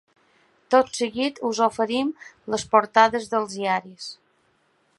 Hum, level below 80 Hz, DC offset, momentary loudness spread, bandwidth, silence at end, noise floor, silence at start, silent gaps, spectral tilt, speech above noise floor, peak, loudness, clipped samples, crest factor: none; -64 dBFS; under 0.1%; 14 LU; 11.5 kHz; 0.85 s; -65 dBFS; 0.7 s; none; -3.5 dB/octave; 43 dB; -2 dBFS; -22 LUFS; under 0.1%; 22 dB